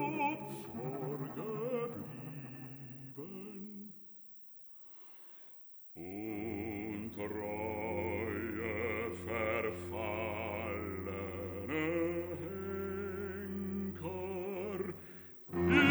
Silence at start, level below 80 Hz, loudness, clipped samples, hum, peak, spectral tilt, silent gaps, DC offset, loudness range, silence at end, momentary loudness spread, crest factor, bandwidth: 0 s; -62 dBFS; -39 LUFS; under 0.1%; none; -14 dBFS; -7 dB/octave; none; under 0.1%; 10 LU; 0 s; 15 LU; 24 dB; over 20 kHz